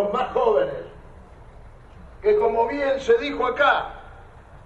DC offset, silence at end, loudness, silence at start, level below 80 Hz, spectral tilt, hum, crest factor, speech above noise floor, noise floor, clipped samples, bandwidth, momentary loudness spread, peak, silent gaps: under 0.1%; 0.05 s; -21 LUFS; 0 s; -46 dBFS; -5 dB/octave; none; 18 dB; 24 dB; -45 dBFS; under 0.1%; 8 kHz; 16 LU; -6 dBFS; none